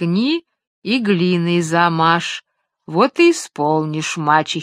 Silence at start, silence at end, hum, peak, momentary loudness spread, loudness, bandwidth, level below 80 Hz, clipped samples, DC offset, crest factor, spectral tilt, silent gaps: 0 s; 0 s; none; 0 dBFS; 10 LU; -17 LUFS; 13 kHz; -66 dBFS; under 0.1%; under 0.1%; 16 dB; -5 dB/octave; 0.67-0.82 s